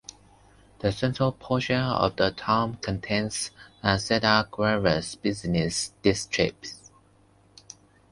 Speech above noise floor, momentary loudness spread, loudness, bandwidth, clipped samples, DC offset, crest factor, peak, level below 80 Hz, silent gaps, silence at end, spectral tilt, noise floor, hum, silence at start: 34 dB; 9 LU; -26 LUFS; 11.5 kHz; under 0.1%; under 0.1%; 22 dB; -4 dBFS; -50 dBFS; none; 1.35 s; -4.5 dB/octave; -59 dBFS; none; 0.8 s